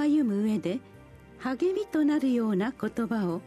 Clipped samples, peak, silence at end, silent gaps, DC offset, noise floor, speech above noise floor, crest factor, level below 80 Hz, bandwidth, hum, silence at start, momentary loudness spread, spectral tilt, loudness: under 0.1%; -16 dBFS; 0 s; none; under 0.1%; -49 dBFS; 22 dB; 12 dB; -62 dBFS; 13.5 kHz; none; 0 s; 9 LU; -7.5 dB/octave; -28 LUFS